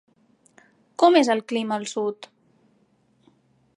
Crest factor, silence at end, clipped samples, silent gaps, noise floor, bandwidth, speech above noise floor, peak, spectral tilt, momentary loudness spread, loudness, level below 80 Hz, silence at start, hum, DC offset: 20 dB; 1.5 s; under 0.1%; none; -64 dBFS; 11 kHz; 43 dB; -4 dBFS; -4 dB/octave; 18 LU; -22 LUFS; -80 dBFS; 1 s; none; under 0.1%